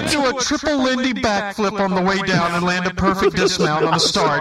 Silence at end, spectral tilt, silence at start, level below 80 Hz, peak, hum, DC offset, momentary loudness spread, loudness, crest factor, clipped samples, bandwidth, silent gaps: 0 s; -4 dB/octave; 0 s; -42 dBFS; -2 dBFS; none; under 0.1%; 4 LU; -18 LUFS; 16 dB; under 0.1%; 15 kHz; none